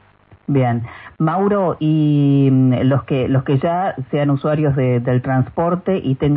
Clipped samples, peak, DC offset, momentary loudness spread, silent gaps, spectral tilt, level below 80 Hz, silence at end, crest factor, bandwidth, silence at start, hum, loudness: under 0.1%; -4 dBFS; under 0.1%; 7 LU; none; -13.5 dB/octave; -48 dBFS; 0 s; 12 dB; 3.9 kHz; 0.5 s; none; -17 LUFS